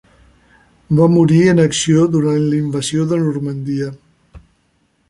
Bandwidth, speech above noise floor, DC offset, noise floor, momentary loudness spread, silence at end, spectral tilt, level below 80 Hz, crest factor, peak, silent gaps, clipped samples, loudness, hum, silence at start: 11.5 kHz; 47 dB; under 0.1%; -61 dBFS; 11 LU; 0.7 s; -6 dB/octave; -48 dBFS; 14 dB; -2 dBFS; none; under 0.1%; -15 LUFS; none; 0.9 s